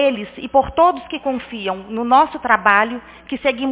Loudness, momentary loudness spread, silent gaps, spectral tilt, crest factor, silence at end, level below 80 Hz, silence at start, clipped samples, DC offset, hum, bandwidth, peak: -17 LUFS; 11 LU; none; -8 dB/octave; 18 dB; 0 s; -46 dBFS; 0 s; under 0.1%; under 0.1%; none; 4 kHz; 0 dBFS